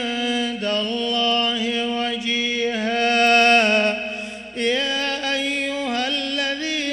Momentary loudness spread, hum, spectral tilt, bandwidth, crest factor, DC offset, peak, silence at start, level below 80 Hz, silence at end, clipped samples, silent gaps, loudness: 9 LU; none; -2.5 dB/octave; 13.5 kHz; 16 dB; under 0.1%; -4 dBFS; 0 s; -58 dBFS; 0 s; under 0.1%; none; -19 LUFS